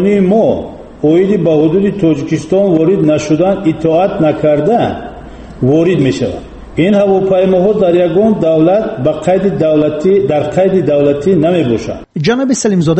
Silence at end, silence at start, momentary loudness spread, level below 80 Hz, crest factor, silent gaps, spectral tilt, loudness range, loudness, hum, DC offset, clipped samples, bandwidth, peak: 0 s; 0 s; 7 LU; -38 dBFS; 10 dB; none; -7 dB/octave; 2 LU; -11 LUFS; none; under 0.1%; under 0.1%; 8.8 kHz; 0 dBFS